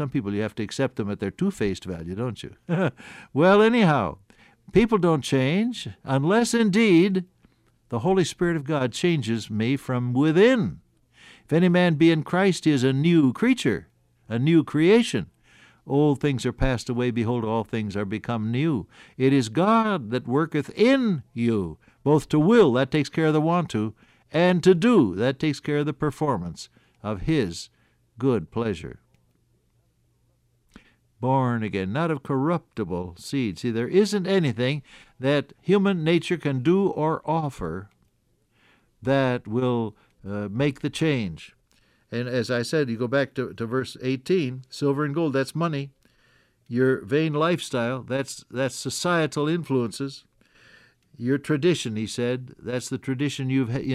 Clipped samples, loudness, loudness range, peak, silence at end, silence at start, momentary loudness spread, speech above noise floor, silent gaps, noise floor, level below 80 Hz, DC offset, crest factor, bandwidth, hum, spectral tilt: under 0.1%; -24 LUFS; 6 LU; -6 dBFS; 0 s; 0 s; 12 LU; 44 dB; none; -67 dBFS; -50 dBFS; under 0.1%; 18 dB; 13.5 kHz; none; -6.5 dB/octave